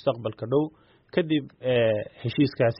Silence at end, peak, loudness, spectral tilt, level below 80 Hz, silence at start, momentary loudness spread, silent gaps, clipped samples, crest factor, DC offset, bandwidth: 0 s; -10 dBFS; -26 LUFS; -6 dB/octave; -60 dBFS; 0.05 s; 8 LU; none; under 0.1%; 16 dB; under 0.1%; 5.6 kHz